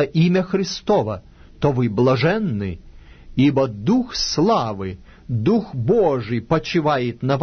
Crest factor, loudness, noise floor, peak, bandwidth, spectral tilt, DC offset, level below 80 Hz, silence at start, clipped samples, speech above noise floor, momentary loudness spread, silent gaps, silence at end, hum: 14 dB; -20 LUFS; -40 dBFS; -6 dBFS; 6.6 kHz; -6.5 dB/octave; under 0.1%; -44 dBFS; 0 s; under 0.1%; 22 dB; 11 LU; none; 0 s; none